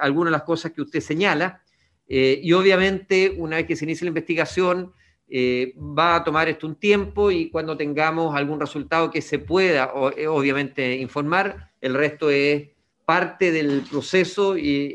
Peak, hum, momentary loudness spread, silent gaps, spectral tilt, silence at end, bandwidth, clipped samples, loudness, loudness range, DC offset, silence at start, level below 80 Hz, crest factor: -2 dBFS; none; 7 LU; none; -5.5 dB/octave; 0 s; 10 kHz; under 0.1%; -21 LUFS; 2 LU; under 0.1%; 0 s; -50 dBFS; 18 dB